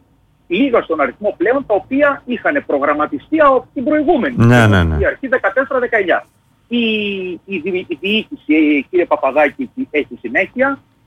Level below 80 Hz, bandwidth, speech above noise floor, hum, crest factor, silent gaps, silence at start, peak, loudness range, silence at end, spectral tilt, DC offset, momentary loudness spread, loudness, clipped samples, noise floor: -36 dBFS; 12.5 kHz; 39 dB; none; 14 dB; none; 0.5 s; -2 dBFS; 4 LU; 0.3 s; -7 dB/octave; under 0.1%; 8 LU; -15 LUFS; under 0.1%; -54 dBFS